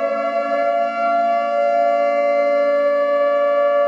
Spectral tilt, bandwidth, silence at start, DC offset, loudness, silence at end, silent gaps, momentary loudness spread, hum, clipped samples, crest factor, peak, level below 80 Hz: -4 dB/octave; 7.2 kHz; 0 s; under 0.1%; -17 LUFS; 0 s; none; 3 LU; none; under 0.1%; 10 dB; -8 dBFS; -76 dBFS